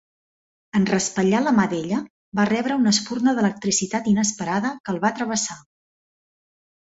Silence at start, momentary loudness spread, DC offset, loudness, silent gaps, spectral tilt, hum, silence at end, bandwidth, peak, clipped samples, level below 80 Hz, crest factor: 0.75 s; 7 LU; under 0.1%; -22 LUFS; 2.10-2.32 s, 4.80-4.84 s; -4 dB/octave; none; 1.25 s; 8 kHz; -4 dBFS; under 0.1%; -60 dBFS; 18 dB